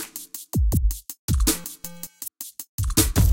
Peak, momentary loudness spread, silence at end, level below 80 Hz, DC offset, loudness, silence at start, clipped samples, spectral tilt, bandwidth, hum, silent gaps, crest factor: -6 dBFS; 15 LU; 0 s; -28 dBFS; under 0.1%; -25 LUFS; 0 s; under 0.1%; -4 dB/octave; 17.5 kHz; none; 1.19-1.28 s, 2.69-2.78 s; 18 dB